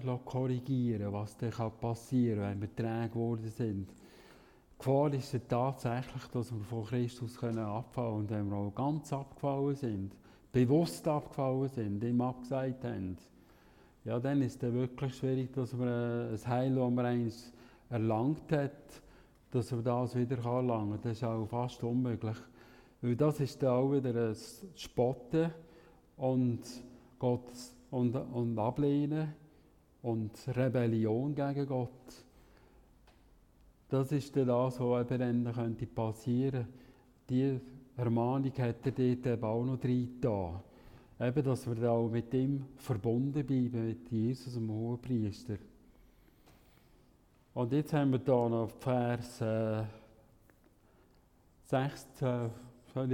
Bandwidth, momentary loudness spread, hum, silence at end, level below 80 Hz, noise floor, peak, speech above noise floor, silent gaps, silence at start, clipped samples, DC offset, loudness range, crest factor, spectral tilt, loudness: 15.5 kHz; 9 LU; none; 0 s; -64 dBFS; -66 dBFS; -16 dBFS; 32 dB; none; 0 s; under 0.1%; under 0.1%; 3 LU; 18 dB; -8 dB/octave; -35 LUFS